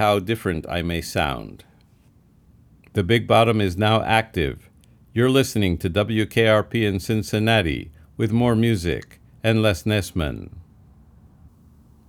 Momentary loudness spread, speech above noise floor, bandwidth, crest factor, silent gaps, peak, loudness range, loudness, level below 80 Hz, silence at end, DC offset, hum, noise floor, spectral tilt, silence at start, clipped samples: 11 LU; 34 dB; 17 kHz; 20 dB; none; -2 dBFS; 4 LU; -21 LUFS; -44 dBFS; 1.5 s; under 0.1%; none; -55 dBFS; -6 dB/octave; 0 s; under 0.1%